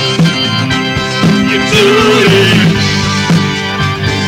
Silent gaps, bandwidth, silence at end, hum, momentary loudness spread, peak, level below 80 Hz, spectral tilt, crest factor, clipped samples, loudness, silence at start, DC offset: none; 16 kHz; 0 s; none; 6 LU; 0 dBFS; -34 dBFS; -5 dB/octave; 8 dB; under 0.1%; -9 LUFS; 0 s; under 0.1%